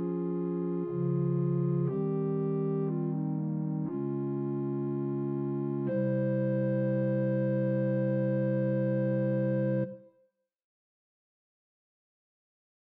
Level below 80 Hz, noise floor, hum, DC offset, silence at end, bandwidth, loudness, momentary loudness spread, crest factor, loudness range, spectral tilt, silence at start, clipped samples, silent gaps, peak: -80 dBFS; -71 dBFS; none; under 0.1%; 2.85 s; 3.9 kHz; -31 LUFS; 4 LU; 10 dB; 5 LU; -11 dB/octave; 0 s; under 0.1%; none; -20 dBFS